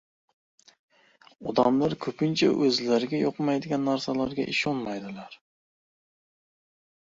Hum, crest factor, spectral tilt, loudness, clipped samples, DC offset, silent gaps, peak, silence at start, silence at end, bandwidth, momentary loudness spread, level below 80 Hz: none; 22 dB; -5.5 dB/octave; -26 LUFS; under 0.1%; under 0.1%; none; -8 dBFS; 1.4 s; 1.75 s; 7.8 kHz; 13 LU; -64 dBFS